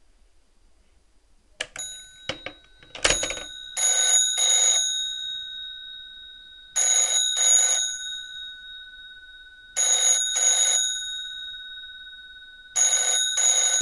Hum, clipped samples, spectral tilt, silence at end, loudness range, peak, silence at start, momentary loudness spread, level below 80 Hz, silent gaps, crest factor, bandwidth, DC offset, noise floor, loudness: none; under 0.1%; 2.5 dB/octave; 0 s; 5 LU; -2 dBFS; 1.6 s; 22 LU; -54 dBFS; none; 24 dB; 12.5 kHz; under 0.1%; -59 dBFS; -20 LUFS